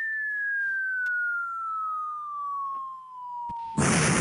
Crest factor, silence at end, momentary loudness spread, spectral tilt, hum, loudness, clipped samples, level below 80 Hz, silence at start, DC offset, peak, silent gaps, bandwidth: 18 dB; 0 s; 12 LU; -3.5 dB/octave; none; -28 LUFS; under 0.1%; -54 dBFS; 0 s; under 0.1%; -10 dBFS; none; 12 kHz